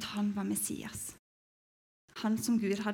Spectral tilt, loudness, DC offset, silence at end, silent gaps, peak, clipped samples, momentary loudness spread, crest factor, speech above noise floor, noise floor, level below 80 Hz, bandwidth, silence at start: -4.5 dB/octave; -34 LUFS; under 0.1%; 0 s; 1.19-2.08 s; -18 dBFS; under 0.1%; 12 LU; 16 dB; over 57 dB; under -90 dBFS; -68 dBFS; 17.5 kHz; 0 s